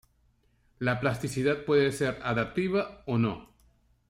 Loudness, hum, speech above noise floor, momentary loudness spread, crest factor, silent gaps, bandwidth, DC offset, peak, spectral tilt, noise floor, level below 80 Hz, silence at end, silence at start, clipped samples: -29 LUFS; none; 39 dB; 6 LU; 16 dB; none; 16 kHz; under 0.1%; -12 dBFS; -6 dB/octave; -67 dBFS; -58 dBFS; 0.65 s; 0.8 s; under 0.1%